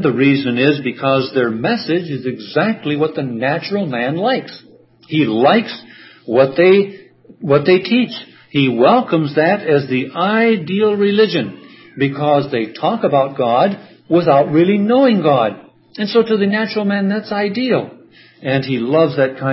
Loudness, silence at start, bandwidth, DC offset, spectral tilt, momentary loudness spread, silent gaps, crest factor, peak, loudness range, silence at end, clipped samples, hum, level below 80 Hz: -15 LUFS; 0 s; 5.8 kHz; under 0.1%; -11 dB/octave; 9 LU; none; 16 dB; 0 dBFS; 4 LU; 0 s; under 0.1%; none; -62 dBFS